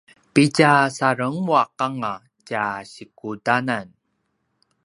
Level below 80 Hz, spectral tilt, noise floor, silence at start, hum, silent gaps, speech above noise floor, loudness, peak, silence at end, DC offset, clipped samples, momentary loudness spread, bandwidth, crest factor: -66 dBFS; -5.5 dB/octave; -72 dBFS; 0.35 s; none; none; 52 dB; -20 LUFS; 0 dBFS; 1 s; under 0.1%; under 0.1%; 18 LU; 11.5 kHz; 22 dB